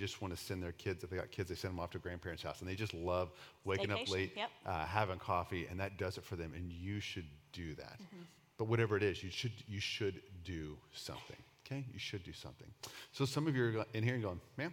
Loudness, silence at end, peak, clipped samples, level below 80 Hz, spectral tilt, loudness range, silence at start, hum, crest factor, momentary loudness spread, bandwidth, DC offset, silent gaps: -41 LUFS; 0 s; -16 dBFS; under 0.1%; -66 dBFS; -5.5 dB/octave; 5 LU; 0 s; none; 26 dB; 15 LU; 17.5 kHz; under 0.1%; none